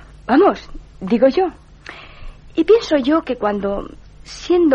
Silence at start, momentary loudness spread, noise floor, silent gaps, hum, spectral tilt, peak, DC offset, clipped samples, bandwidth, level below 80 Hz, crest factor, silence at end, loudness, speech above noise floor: 0.3 s; 22 LU; -38 dBFS; none; none; -6 dB/octave; -2 dBFS; under 0.1%; under 0.1%; 8.6 kHz; -40 dBFS; 14 dB; 0 s; -17 LUFS; 22 dB